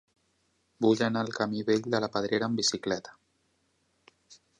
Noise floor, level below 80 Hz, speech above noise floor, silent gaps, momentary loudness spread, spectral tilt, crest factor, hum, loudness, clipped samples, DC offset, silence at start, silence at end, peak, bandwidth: -73 dBFS; -70 dBFS; 44 dB; none; 6 LU; -4 dB/octave; 20 dB; none; -29 LUFS; under 0.1%; under 0.1%; 0.8 s; 0.25 s; -12 dBFS; 11 kHz